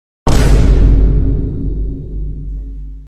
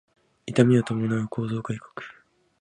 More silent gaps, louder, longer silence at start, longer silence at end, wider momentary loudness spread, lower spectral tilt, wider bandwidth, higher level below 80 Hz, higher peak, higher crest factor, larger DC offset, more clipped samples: neither; first, -15 LUFS vs -25 LUFS; second, 0.25 s vs 0.45 s; second, 0 s vs 0.5 s; second, 15 LU vs 21 LU; about the same, -7 dB/octave vs -7.5 dB/octave; about the same, 11 kHz vs 10 kHz; first, -12 dBFS vs -62 dBFS; first, 0 dBFS vs -4 dBFS; second, 12 dB vs 22 dB; neither; neither